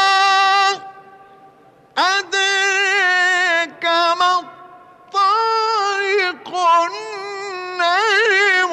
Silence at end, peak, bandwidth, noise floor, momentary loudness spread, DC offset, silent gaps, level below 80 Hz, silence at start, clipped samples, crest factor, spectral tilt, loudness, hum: 0 s; -6 dBFS; 13.5 kHz; -49 dBFS; 13 LU; under 0.1%; none; -72 dBFS; 0 s; under 0.1%; 10 dB; 0.5 dB/octave; -16 LUFS; none